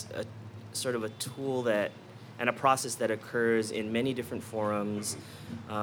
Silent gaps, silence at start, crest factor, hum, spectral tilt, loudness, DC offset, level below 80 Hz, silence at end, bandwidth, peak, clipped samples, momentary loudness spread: none; 0 s; 22 dB; none; -4 dB/octave; -32 LUFS; under 0.1%; -74 dBFS; 0 s; 19.5 kHz; -10 dBFS; under 0.1%; 14 LU